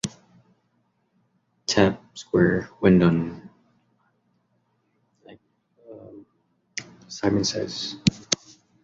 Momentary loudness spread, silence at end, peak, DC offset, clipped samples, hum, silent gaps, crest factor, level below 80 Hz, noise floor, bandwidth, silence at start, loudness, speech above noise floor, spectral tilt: 20 LU; 0.5 s; -2 dBFS; under 0.1%; under 0.1%; none; none; 24 dB; -52 dBFS; -70 dBFS; 10 kHz; 0.05 s; -23 LUFS; 48 dB; -5 dB/octave